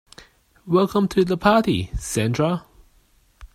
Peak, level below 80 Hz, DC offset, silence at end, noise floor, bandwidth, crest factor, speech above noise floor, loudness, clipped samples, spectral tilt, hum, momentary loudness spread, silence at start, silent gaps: -2 dBFS; -42 dBFS; under 0.1%; 0.1 s; -58 dBFS; 16 kHz; 20 dB; 39 dB; -21 LUFS; under 0.1%; -6 dB/octave; none; 8 LU; 0.65 s; none